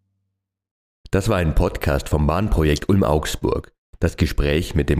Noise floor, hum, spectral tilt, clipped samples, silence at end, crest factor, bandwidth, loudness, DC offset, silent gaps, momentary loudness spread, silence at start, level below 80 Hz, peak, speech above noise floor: -77 dBFS; none; -6.5 dB/octave; under 0.1%; 0 s; 16 dB; 15.5 kHz; -21 LUFS; under 0.1%; 3.78-3.93 s; 6 LU; 1.1 s; -26 dBFS; -4 dBFS; 58 dB